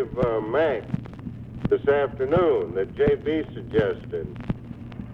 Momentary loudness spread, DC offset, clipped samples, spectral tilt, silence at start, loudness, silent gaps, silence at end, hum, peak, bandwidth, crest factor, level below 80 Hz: 13 LU; under 0.1%; under 0.1%; -9 dB/octave; 0 s; -25 LUFS; none; 0 s; none; -6 dBFS; 5.4 kHz; 18 dB; -44 dBFS